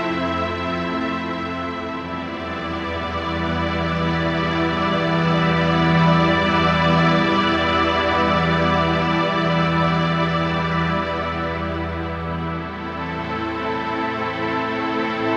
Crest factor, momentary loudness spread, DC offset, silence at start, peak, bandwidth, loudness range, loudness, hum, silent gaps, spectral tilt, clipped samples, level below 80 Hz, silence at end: 16 dB; 10 LU; under 0.1%; 0 s; -6 dBFS; 7.4 kHz; 8 LU; -20 LUFS; none; none; -6.5 dB/octave; under 0.1%; -40 dBFS; 0 s